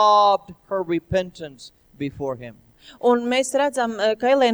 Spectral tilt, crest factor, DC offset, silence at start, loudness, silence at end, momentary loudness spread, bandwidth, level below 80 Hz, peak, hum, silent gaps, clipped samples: -4 dB/octave; 16 dB; under 0.1%; 0 s; -21 LUFS; 0 s; 16 LU; over 20 kHz; -52 dBFS; -6 dBFS; none; none; under 0.1%